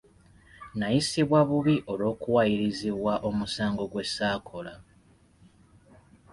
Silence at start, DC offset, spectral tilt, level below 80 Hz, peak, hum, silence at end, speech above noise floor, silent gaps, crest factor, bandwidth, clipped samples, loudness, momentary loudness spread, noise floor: 0.6 s; under 0.1%; -5.5 dB/octave; -56 dBFS; -12 dBFS; none; 1.5 s; 33 dB; none; 16 dB; 11.5 kHz; under 0.1%; -27 LUFS; 11 LU; -60 dBFS